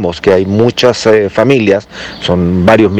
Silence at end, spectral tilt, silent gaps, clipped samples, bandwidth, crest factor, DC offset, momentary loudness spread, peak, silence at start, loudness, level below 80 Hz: 0 s; -6 dB/octave; none; 3%; 13.5 kHz; 10 dB; under 0.1%; 6 LU; 0 dBFS; 0 s; -10 LUFS; -38 dBFS